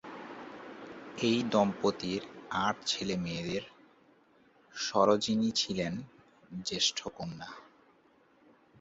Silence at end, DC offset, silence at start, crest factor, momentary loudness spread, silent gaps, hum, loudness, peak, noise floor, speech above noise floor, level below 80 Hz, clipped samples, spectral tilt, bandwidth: 1.15 s; under 0.1%; 0.05 s; 22 dB; 19 LU; none; none; -32 LUFS; -12 dBFS; -65 dBFS; 34 dB; -66 dBFS; under 0.1%; -4 dB/octave; 8 kHz